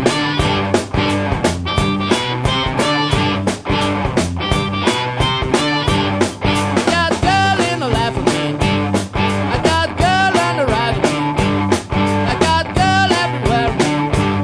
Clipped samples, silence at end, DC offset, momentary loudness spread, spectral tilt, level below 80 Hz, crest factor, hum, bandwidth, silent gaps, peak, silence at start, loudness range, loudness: under 0.1%; 0 s; under 0.1%; 4 LU; -5 dB/octave; -30 dBFS; 16 dB; none; 11 kHz; none; 0 dBFS; 0 s; 1 LU; -16 LUFS